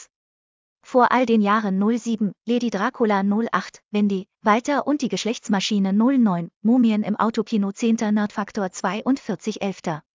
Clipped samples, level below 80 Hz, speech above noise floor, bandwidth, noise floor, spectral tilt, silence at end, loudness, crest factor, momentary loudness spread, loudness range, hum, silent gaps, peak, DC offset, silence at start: under 0.1%; -68 dBFS; over 69 dB; 7.6 kHz; under -90 dBFS; -6 dB/octave; 0.15 s; -22 LUFS; 16 dB; 8 LU; 2 LU; none; 0.16-0.76 s, 6.56-6.61 s; -4 dBFS; under 0.1%; 0 s